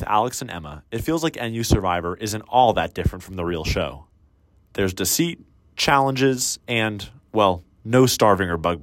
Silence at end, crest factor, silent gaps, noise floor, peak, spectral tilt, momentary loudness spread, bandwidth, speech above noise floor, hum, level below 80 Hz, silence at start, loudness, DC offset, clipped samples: 0 s; 18 dB; none; -57 dBFS; -4 dBFS; -4.5 dB/octave; 13 LU; 16.5 kHz; 36 dB; none; -38 dBFS; 0 s; -21 LUFS; under 0.1%; under 0.1%